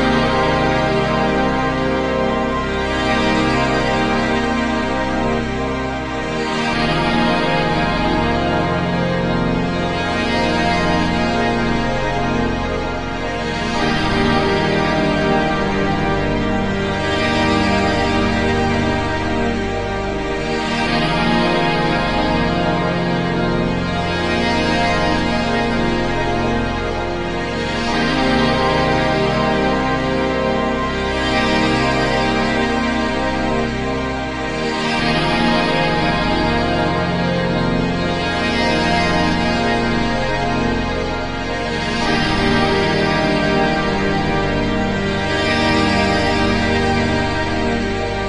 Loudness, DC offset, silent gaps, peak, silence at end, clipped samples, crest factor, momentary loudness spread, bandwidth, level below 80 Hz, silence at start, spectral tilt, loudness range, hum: -17 LUFS; under 0.1%; none; -2 dBFS; 0 s; under 0.1%; 14 dB; 5 LU; 10.5 kHz; -30 dBFS; 0 s; -5.5 dB/octave; 2 LU; none